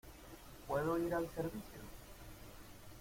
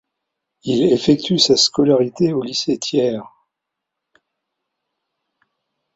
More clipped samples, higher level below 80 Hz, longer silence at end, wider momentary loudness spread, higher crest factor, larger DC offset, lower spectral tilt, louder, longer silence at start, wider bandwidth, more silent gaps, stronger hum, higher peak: neither; about the same, -58 dBFS vs -56 dBFS; second, 0 s vs 2.7 s; first, 19 LU vs 9 LU; about the same, 18 dB vs 18 dB; neither; first, -6 dB/octave vs -4.5 dB/octave; second, -40 LUFS vs -16 LUFS; second, 0.05 s vs 0.65 s; first, 16.5 kHz vs 8 kHz; neither; neither; second, -26 dBFS vs -2 dBFS